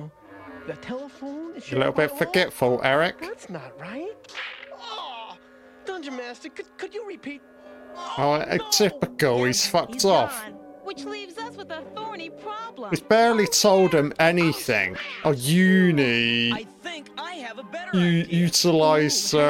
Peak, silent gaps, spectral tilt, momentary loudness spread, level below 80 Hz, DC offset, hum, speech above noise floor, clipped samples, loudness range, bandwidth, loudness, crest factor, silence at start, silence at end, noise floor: -4 dBFS; none; -4 dB/octave; 19 LU; -60 dBFS; under 0.1%; none; 27 dB; under 0.1%; 16 LU; 17 kHz; -21 LUFS; 20 dB; 0 s; 0 s; -50 dBFS